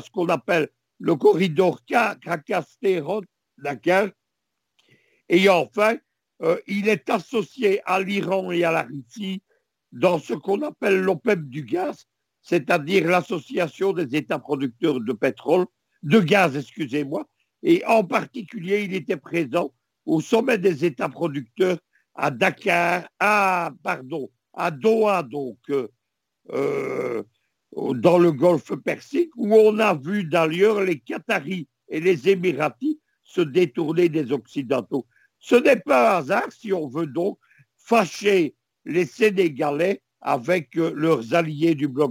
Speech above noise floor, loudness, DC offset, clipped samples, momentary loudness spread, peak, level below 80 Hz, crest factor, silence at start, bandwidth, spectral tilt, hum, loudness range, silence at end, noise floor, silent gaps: 59 dB; -22 LUFS; under 0.1%; under 0.1%; 12 LU; -4 dBFS; -72 dBFS; 18 dB; 0.05 s; 17 kHz; -6 dB/octave; none; 4 LU; 0 s; -80 dBFS; none